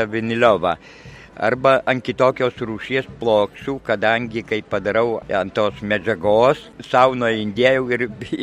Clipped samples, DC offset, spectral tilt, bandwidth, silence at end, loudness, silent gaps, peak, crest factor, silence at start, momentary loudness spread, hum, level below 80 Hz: under 0.1%; under 0.1%; -6 dB/octave; 10.5 kHz; 0 s; -19 LUFS; none; 0 dBFS; 18 dB; 0 s; 8 LU; none; -50 dBFS